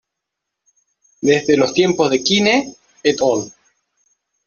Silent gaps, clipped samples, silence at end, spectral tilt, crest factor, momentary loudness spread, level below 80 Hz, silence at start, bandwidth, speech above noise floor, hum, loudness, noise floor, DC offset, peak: none; under 0.1%; 0.95 s; -4 dB/octave; 16 dB; 8 LU; -58 dBFS; 1.2 s; 7.6 kHz; 65 dB; none; -16 LUFS; -80 dBFS; under 0.1%; -2 dBFS